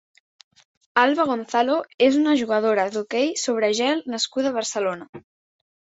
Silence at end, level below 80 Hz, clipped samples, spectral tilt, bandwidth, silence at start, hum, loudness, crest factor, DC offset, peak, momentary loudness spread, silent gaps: 0.75 s; -70 dBFS; under 0.1%; -3 dB/octave; 8 kHz; 0.95 s; none; -22 LUFS; 20 dB; under 0.1%; -2 dBFS; 6 LU; 1.94-1.98 s, 5.09-5.13 s